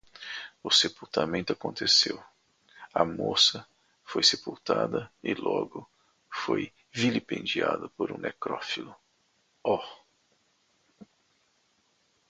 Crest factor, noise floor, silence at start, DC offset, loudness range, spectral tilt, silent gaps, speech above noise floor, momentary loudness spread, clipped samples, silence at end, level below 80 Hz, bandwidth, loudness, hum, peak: 24 dB; -71 dBFS; 0.2 s; under 0.1%; 11 LU; -3 dB/octave; none; 42 dB; 17 LU; under 0.1%; 1.25 s; -66 dBFS; 9.6 kHz; -28 LUFS; none; -8 dBFS